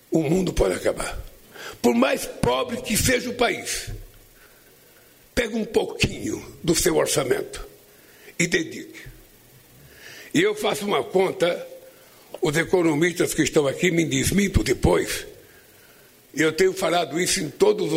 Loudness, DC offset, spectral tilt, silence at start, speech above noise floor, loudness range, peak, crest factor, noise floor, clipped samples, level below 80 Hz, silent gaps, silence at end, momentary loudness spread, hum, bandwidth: -22 LUFS; under 0.1%; -4 dB/octave; 0.1 s; 31 dB; 5 LU; -6 dBFS; 18 dB; -53 dBFS; under 0.1%; -40 dBFS; none; 0 s; 17 LU; none; 16 kHz